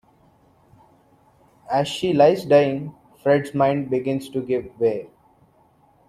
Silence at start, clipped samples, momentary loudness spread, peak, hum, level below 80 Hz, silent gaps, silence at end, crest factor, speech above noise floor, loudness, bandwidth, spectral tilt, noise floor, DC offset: 1.7 s; under 0.1%; 10 LU; -4 dBFS; none; -60 dBFS; none; 1.05 s; 20 dB; 38 dB; -21 LUFS; 13 kHz; -6.5 dB/octave; -58 dBFS; under 0.1%